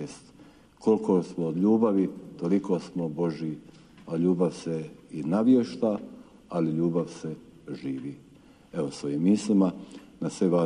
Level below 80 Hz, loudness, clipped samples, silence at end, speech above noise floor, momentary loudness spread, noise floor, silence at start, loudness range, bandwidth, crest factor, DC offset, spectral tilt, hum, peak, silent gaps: -66 dBFS; -27 LUFS; under 0.1%; 0 s; 28 dB; 16 LU; -54 dBFS; 0 s; 4 LU; 10.5 kHz; 16 dB; under 0.1%; -8 dB/octave; none; -10 dBFS; none